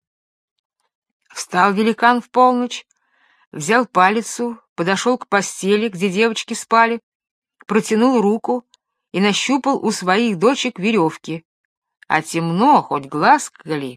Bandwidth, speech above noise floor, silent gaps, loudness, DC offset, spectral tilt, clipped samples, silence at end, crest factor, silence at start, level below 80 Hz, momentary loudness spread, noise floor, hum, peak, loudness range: 14.5 kHz; 43 dB; 3.47-3.51 s, 4.69-4.76 s, 7.03-7.20 s, 7.31-7.42 s, 11.45-11.82 s; -17 LUFS; under 0.1%; -4.5 dB/octave; under 0.1%; 0 s; 18 dB; 1.35 s; -70 dBFS; 11 LU; -60 dBFS; none; 0 dBFS; 2 LU